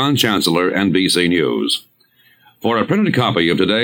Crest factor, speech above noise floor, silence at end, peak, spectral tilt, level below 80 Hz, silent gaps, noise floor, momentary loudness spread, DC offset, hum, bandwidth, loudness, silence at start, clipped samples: 14 dB; 39 dB; 0 s; -2 dBFS; -4.5 dB/octave; -54 dBFS; none; -54 dBFS; 5 LU; under 0.1%; none; 18.5 kHz; -16 LUFS; 0 s; under 0.1%